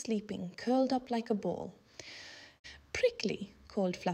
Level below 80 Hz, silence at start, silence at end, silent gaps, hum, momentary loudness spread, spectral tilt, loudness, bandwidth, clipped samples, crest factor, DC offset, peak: -66 dBFS; 0 s; 0 s; 2.59-2.64 s; none; 19 LU; -5.5 dB/octave; -35 LUFS; 11 kHz; under 0.1%; 18 dB; under 0.1%; -18 dBFS